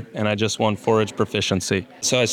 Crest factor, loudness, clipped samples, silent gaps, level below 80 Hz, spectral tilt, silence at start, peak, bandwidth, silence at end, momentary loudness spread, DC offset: 16 dB; -21 LUFS; under 0.1%; none; -62 dBFS; -4 dB/octave; 0 s; -6 dBFS; 16.5 kHz; 0 s; 3 LU; under 0.1%